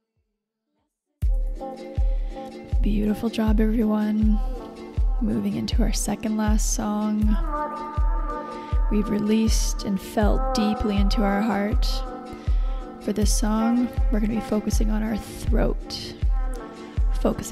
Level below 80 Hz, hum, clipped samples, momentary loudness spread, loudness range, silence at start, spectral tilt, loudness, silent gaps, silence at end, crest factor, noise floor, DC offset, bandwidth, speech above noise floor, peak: -26 dBFS; none; under 0.1%; 10 LU; 3 LU; 1.2 s; -5.5 dB/octave; -25 LUFS; none; 0 s; 14 dB; -79 dBFS; under 0.1%; 14 kHz; 57 dB; -8 dBFS